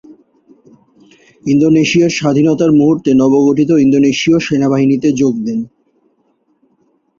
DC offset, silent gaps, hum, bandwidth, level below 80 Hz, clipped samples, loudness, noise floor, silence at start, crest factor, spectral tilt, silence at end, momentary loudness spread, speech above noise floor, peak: under 0.1%; none; none; 7.6 kHz; -52 dBFS; under 0.1%; -11 LUFS; -59 dBFS; 0.1 s; 12 dB; -6 dB/octave; 1.5 s; 7 LU; 48 dB; -2 dBFS